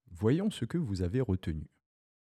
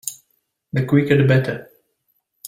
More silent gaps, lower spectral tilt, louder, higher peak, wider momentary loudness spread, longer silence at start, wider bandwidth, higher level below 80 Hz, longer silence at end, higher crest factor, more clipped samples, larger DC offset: neither; about the same, -7.5 dB/octave vs -6.5 dB/octave; second, -33 LUFS vs -18 LUFS; second, -16 dBFS vs -2 dBFS; second, 11 LU vs 15 LU; about the same, 0.1 s vs 0.05 s; second, 13 kHz vs 16 kHz; about the same, -52 dBFS vs -56 dBFS; first, 0.55 s vs 0 s; about the same, 18 dB vs 18 dB; neither; neither